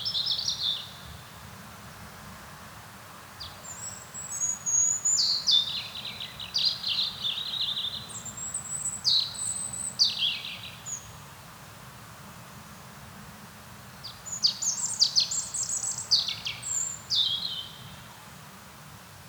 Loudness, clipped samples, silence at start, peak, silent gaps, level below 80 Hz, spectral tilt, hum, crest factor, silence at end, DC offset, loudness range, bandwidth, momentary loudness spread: -26 LUFS; under 0.1%; 0 s; -10 dBFS; none; -60 dBFS; 0.5 dB/octave; none; 22 dB; 0 s; under 0.1%; 16 LU; over 20 kHz; 23 LU